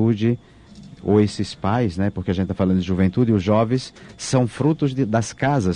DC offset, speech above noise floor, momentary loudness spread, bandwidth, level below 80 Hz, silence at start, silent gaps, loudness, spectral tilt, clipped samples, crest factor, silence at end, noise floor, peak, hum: under 0.1%; 23 dB; 7 LU; 10.5 kHz; -48 dBFS; 0 s; none; -21 LUFS; -7 dB/octave; under 0.1%; 16 dB; 0 s; -43 dBFS; -4 dBFS; none